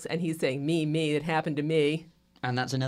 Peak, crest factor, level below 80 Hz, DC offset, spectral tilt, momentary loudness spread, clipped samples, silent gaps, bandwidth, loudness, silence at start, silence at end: -14 dBFS; 14 dB; -66 dBFS; under 0.1%; -6 dB/octave; 6 LU; under 0.1%; none; 15 kHz; -29 LUFS; 0 s; 0 s